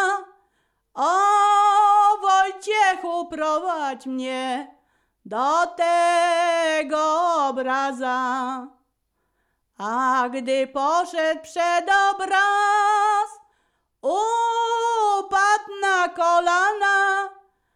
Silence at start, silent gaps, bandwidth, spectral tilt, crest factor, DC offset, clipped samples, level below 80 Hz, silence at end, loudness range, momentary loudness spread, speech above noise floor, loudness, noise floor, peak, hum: 0 s; none; 11.5 kHz; -1 dB/octave; 14 dB; under 0.1%; under 0.1%; -68 dBFS; 0.45 s; 6 LU; 10 LU; 52 dB; -21 LUFS; -73 dBFS; -8 dBFS; none